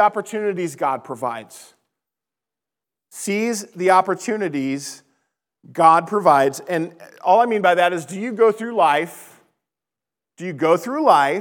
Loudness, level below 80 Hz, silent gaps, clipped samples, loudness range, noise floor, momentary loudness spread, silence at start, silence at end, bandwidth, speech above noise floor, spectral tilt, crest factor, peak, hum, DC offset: -19 LUFS; -88 dBFS; none; under 0.1%; 8 LU; -88 dBFS; 13 LU; 0 s; 0 s; 19 kHz; 70 dB; -4.5 dB/octave; 20 dB; 0 dBFS; none; under 0.1%